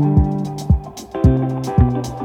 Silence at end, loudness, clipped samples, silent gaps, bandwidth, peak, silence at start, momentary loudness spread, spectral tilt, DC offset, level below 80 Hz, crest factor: 0 s; -18 LUFS; under 0.1%; none; 13 kHz; 0 dBFS; 0 s; 5 LU; -8.5 dB/octave; under 0.1%; -24 dBFS; 16 dB